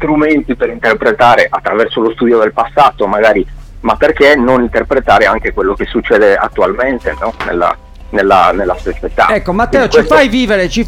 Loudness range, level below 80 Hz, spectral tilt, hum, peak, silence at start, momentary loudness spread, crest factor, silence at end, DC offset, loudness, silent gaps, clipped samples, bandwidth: 2 LU; -28 dBFS; -5.5 dB/octave; none; 0 dBFS; 0 s; 9 LU; 10 dB; 0 s; under 0.1%; -10 LUFS; none; under 0.1%; 16 kHz